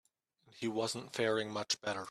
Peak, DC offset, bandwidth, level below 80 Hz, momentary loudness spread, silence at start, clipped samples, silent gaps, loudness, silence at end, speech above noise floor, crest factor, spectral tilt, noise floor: -20 dBFS; under 0.1%; 14 kHz; -78 dBFS; 5 LU; 0.55 s; under 0.1%; none; -36 LUFS; 0 s; 34 dB; 18 dB; -3 dB/octave; -70 dBFS